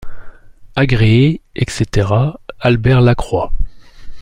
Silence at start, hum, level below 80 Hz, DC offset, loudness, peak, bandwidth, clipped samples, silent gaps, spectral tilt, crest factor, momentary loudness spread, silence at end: 0 s; none; -26 dBFS; under 0.1%; -14 LUFS; -2 dBFS; 10.5 kHz; under 0.1%; none; -7 dB/octave; 12 dB; 12 LU; 0 s